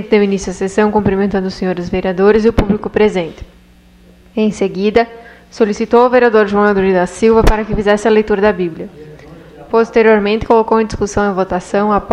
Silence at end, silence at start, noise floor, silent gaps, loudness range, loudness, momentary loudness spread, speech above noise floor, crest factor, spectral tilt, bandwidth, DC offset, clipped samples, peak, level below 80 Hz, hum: 0 s; 0 s; -44 dBFS; none; 4 LU; -13 LUFS; 8 LU; 32 dB; 12 dB; -6 dB/octave; 10.5 kHz; under 0.1%; under 0.1%; 0 dBFS; -28 dBFS; none